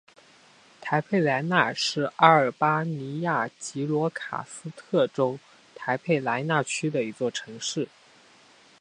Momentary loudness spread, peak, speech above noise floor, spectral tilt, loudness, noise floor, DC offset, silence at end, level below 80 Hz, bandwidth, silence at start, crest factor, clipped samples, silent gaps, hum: 13 LU; -2 dBFS; 30 dB; -4.5 dB/octave; -26 LUFS; -56 dBFS; under 0.1%; 0.95 s; -74 dBFS; 10.5 kHz; 0.8 s; 24 dB; under 0.1%; none; none